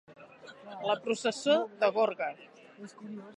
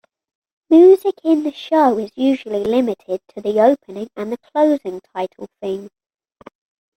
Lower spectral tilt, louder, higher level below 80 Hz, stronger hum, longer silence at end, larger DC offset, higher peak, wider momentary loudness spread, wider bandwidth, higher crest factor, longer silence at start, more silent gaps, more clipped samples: second, -3.5 dB/octave vs -6.5 dB/octave; second, -30 LUFS vs -17 LUFS; second, -84 dBFS vs -62 dBFS; neither; second, 0.05 s vs 1.1 s; neither; second, -12 dBFS vs -2 dBFS; first, 22 LU vs 17 LU; second, 11.5 kHz vs 14 kHz; about the same, 20 dB vs 16 dB; second, 0.1 s vs 0.7 s; neither; neither